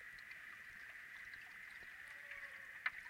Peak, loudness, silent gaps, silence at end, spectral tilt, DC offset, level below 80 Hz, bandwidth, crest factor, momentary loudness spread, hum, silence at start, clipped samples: -26 dBFS; -51 LUFS; none; 0 s; -1 dB/octave; under 0.1%; -80 dBFS; 16 kHz; 28 dB; 6 LU; none; 0 s; under 0.1%